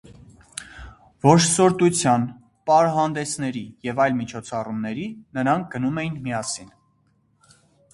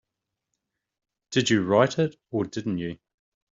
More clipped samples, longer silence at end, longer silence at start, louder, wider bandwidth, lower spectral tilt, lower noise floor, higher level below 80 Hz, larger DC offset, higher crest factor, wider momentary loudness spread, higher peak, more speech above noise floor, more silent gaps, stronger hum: neither; first, 1.3 s vs 0.6 s; second, 0.1 s vs 1.3 s; first, -22 LUFS vs -25 LUFS; first, 11.5 kHz vs 7.8 kHz; about the same, -5 dB/octave vs -4.5 dB/octave; second, -64 dBFS vs -85 dBFS; first, -54 dBFS vs -64 dBFS; neither; about the same, 22 dB vs 22 dB; first, 16 LU vs 11 LU; first, 0 dBFS vs -4 dBFS; second, 43 dB vs 60 dB; neither; neither